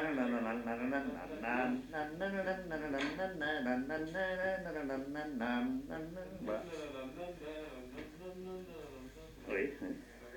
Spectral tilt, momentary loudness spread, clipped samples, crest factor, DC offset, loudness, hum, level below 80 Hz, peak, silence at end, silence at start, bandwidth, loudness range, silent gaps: -6 dB/octave; 12 LU; under 0.1%; 16 dB; under 0.1%; -40 LUFS; none; -62 dBFS; -22 dBFS; 0 s; 0 s; 19 kHz; 7 LU; none